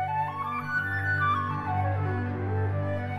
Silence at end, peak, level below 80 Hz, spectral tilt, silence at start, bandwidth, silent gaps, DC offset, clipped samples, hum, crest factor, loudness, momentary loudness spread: 0 s; -16 dBFS; -60 dBFS; -8 dB/octave; 0 s; 5.8 kHz; none; under 0.1%; under 0.1%; none; 12 dB; -28 LUFS; 5 LU